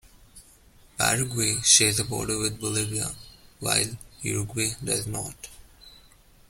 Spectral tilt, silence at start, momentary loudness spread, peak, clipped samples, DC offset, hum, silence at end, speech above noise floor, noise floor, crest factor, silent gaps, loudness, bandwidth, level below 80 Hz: -2 dB/octave; 0.35 s; 18 LU; -4 dBFS; under 0.1%; under 0.1%; none; 0.5 s; 29 dB; -55 dBFS; 24 dB; none; -24 LUFS; 16.5 kHz; -52 dBFS